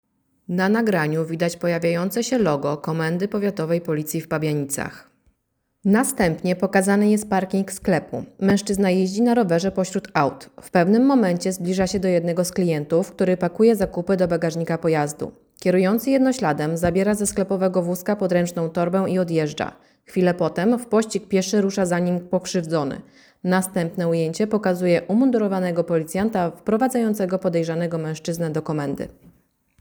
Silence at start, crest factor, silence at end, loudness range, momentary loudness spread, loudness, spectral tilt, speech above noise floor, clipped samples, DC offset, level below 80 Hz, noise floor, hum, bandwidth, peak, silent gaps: 0.5 s; 18 dB; 0.75 s; 3 LU; 7 LU; -21 LUFS; -6 dB/octave; 52 dB; under 0.1%; under 0.1%; -52 dBFS; -73 dBFS; none; over 20 kHz; -4 dBFS; none